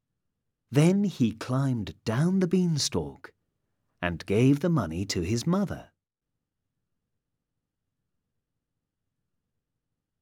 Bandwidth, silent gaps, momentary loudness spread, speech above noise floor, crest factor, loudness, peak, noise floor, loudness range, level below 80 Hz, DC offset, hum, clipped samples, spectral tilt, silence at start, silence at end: 16 kHz; none; 10 LU; 61 dB; 20 dB; -27 LUFS; -10 dBFS; -86 dBFS; 7 LU; -56 dBFS; under 0.1%; none; under 0.1%; -6 dB/octave; 0.7 s; 4.35 s